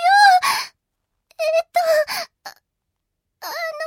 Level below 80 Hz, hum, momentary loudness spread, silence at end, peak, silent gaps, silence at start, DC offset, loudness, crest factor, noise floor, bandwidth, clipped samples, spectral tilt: -74 dBFS; none; 21 LU; 0 s; -2 dBFS; none; 0 s; under 0.1%; -18 LUFS; 18 dB; -78 dBFS; 17 kHz; under 0.1%; 1 dB/octave